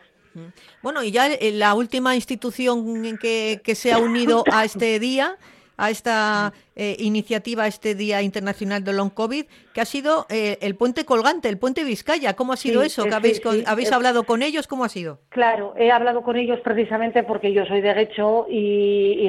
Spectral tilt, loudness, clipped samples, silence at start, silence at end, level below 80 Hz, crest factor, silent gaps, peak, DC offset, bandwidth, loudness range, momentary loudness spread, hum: -4.5 dB/octave; -21 LUFS; under 0.1%; 0.35 s; 0 s; -62 dBFS; 16 dB; none; -4 dBFS; under 0.1%; 14 kHz; 3 LU; 8 LU; none